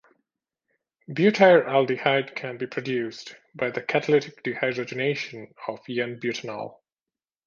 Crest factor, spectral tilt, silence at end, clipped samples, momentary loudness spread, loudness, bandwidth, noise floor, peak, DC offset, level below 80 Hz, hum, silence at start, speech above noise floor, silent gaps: 22 dB; -6 dB/octave; 0.75 s; under 0.1%; 18 LU; -24 LUFS; 7.4 kHz; under -90 dBFS; -4 dBFS; under 0.1%; -74 dBFS; none; 1.1 s; over 66 dB; none